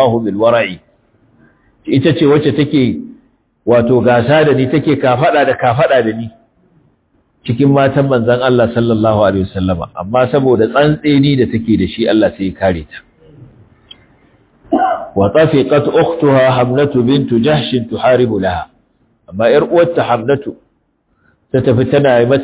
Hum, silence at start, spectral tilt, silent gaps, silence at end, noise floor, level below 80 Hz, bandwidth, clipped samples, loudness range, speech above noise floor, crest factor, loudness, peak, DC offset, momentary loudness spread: none; 0 s; -11 dB/octave; none; 0 s; -60 dBFS; -40 dBFS; 4 kHz; under 0.1%; 4 LU; 49 dB; 12 dB; -12 LUFS; 0 dBFS; under 0.1%; 8 LU